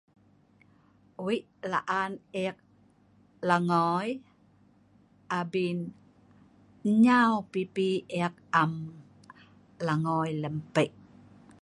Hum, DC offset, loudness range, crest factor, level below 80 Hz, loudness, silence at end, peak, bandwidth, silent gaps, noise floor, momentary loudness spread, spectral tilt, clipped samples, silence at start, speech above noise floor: 50 Hz at -65 dBFS; under 0.1%; 6 LU; 22 dB; -72 dBFS; -29 LUFS; 0.75 s; -8 dBFS; 11.5 kHz; none; -62 dBFS; 12 LU; -6.5 dB/octave; under 0.1%; 1.2 s; 34 dB